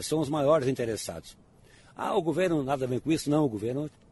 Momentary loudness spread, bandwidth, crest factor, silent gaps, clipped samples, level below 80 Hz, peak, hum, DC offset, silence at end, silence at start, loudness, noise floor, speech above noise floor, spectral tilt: 11 LU; 11.5 kHz; 18 dB; none; under 0.1%; -58 dBFS; -12 dBFS; none; under 0.1%; 0.25 s; 0 s; -28 LUFS; -56 dBFS; 28 dB; -6 dB/octave